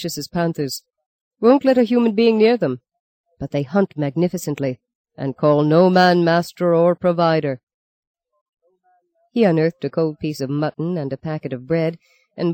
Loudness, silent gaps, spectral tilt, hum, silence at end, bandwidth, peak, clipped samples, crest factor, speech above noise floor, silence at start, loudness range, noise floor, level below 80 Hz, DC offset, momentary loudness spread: -19 LUFS; 1.06-1.31 s, 3.00-3.24 s, 4.95-5.04 s, 7.63-7.67 s, 7.74-8.14 s, 8.41-8.53 s; -6.5 dB/octave; none; 0 s; 16.5 kHz; -2 dBFS; under 0.1%; 16 dB; 45 dB; 0 s; 6 LU; -63 dBFS; -60 dBFS; under 0.1%; 13 LU